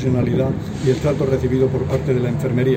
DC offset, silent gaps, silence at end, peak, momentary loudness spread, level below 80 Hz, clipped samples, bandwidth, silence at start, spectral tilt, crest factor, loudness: under 0.1%; none; 0 s; -4 dBFS; 2 LU; -38 dBFS; under 0.1%; 15.5 kHz; 0 s; -8 dB/octave; 14 dB; -19 LUFS